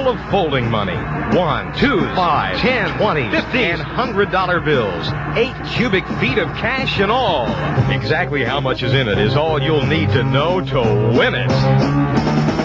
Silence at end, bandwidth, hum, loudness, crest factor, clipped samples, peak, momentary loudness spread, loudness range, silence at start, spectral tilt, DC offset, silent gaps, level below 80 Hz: 0 s; 7.6 kHz; none; -17 LUFS; 16 dB; under 0.1%; -2 dBFS; 4 LU; 2 LU; 0 s; -7 dB/octave; under 0.1%; none; -34 dBFS